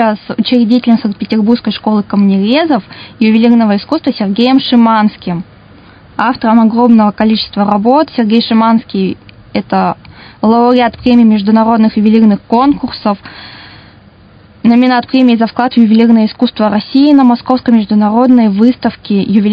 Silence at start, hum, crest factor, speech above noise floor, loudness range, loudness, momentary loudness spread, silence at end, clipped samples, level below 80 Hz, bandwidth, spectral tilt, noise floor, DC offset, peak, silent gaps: 0 s; none; 10 dB; 31 dB; 3 LU; -10 LUFS; 9 LU; 0 s; 0.7%; -46 dBFS; 5.2 kHz; -9 dB/octave; -40 dBFS; under 0.1%; 0 dBFS; none